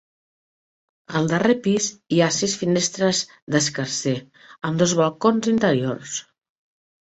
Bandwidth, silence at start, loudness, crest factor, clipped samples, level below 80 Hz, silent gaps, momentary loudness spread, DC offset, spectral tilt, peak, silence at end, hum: 8.4 kHz; 1.1 s; -21 LUFS; 18 dB; under 0.1%; -60 dBFS; 3.42-3.47 s; 9 LU; under 0.1%; -4 dB/octave; -4 dBFS; 0.85 s; none